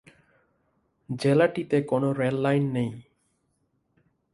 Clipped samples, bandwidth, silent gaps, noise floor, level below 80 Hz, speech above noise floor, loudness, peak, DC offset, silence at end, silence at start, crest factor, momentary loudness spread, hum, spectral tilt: under 0.1%; 11.5 kHz; none; -73 dBFS; -66 dBFS; 48 dB; -25 LUFS; -8 dBFS; under 0.1%; 1.35 s; 1.1 s; 20 dB; 11 LU; none; -7.5 dB/octave